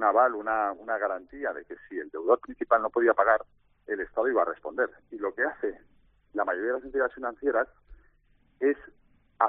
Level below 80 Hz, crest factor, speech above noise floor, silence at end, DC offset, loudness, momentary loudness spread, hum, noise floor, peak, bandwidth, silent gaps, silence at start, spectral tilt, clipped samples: -62 dBFS; 22 dB; 37 dB; 0 s; under 0.1%; -28 LUFS; 12 LU; 50 Hz at -75 dBFS; -65 dBFS; -8 dBFS; 3.8 kHz; none; 0 s; -3.5 dB/octave; under 0.1%